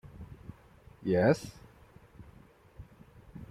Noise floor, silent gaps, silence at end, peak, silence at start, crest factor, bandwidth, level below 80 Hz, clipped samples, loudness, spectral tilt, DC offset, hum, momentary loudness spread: -58 dBFS; none; 0.05 s; -14 dBFS; 0.15 s; 22 dB; 14.5 kHz; -58 dBFS; under 0.1%; -29 LUFS; -7 dB/octave; under 0.1%; none; 28 LU